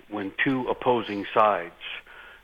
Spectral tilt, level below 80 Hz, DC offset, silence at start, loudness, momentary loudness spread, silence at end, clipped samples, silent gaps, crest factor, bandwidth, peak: -7 dB/octave; -58 dBFS; under 0.1%; 0.1 s; -25 LUFS; 15 LU; 0.1 s; under 0.1%; none; 20 dB; 8.2 kHz; -6 dBFS